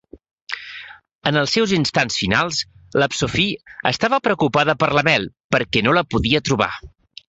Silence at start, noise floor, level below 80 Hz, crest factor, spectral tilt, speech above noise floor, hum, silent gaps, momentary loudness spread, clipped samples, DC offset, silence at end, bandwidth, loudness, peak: 0.15 s; -40 dBFS; -44 dBFS; 18 dB; -4.5 dB/octave; 21 dB; none; 0.31-0.47 s, 1.15-1.19 s, 5.44-5.50 s; 11 LU; under 0.1%; under 0.1%; 0.4 s; 8.2 kHz; -18 LUFS; -2 dBFS